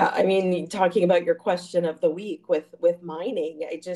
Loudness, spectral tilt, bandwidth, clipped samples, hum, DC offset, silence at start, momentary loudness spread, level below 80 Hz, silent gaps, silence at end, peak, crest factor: -24 LUFS; -6 dB/octave; 12 kHz; under 0.1%; none; under 0.1%; 0 s; 10 LU; -72 dBFS; none; 0 s; -6 dBFS; 16 dB